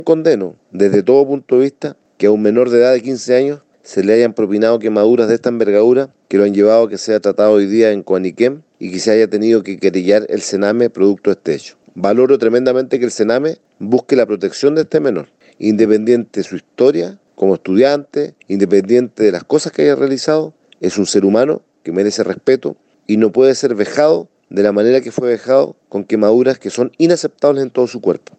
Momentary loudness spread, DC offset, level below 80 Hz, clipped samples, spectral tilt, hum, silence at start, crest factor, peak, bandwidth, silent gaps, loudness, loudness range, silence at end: 9 LU; under 0.1%; -64 dBFS; under 0.1%; -5.5 dB/octave; none; 0 s; 14 dB; 0 dBFS; 9 kHz; none; -14 LUFS; 3 LU; 0.2 s